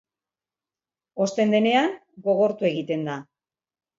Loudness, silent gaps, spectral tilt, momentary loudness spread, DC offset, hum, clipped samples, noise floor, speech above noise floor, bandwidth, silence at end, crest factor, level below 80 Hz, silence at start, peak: -23 LUFS; none; -5.5 dB/octave; 12 LU; under 0.1%; none; under 0.1%; under -90 dBFS; over 68 dB; 7.8 kHz; 0.75 s; 18 dB; -74 dBFS; 1.15 s; -8 dBFS